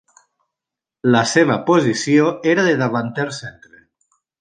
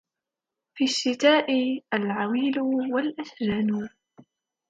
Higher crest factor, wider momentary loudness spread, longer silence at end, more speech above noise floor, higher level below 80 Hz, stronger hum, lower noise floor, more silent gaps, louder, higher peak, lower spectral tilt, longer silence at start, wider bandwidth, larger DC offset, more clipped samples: about the same, 18 dB vs 20 dB; about the same, 10 LU vs 10 LU; first, 0.9 s vs 0.5 s; first, 70 dB vs 63 dB; about the same, -62 dBFS vs -64 dBFS; neither; about the same, -86 dBFS vs -88 dBFS; neither; first, -17 LUFS vs -25 LUFS; first, -2 dBFS vs -6 dBFS; about the same, -5 dB/octave vs -4.5 dB/octave; first, 1.05 s vs 0.75 s; about the same, 9.6 kHz vs 9.2 kHz; neither; neither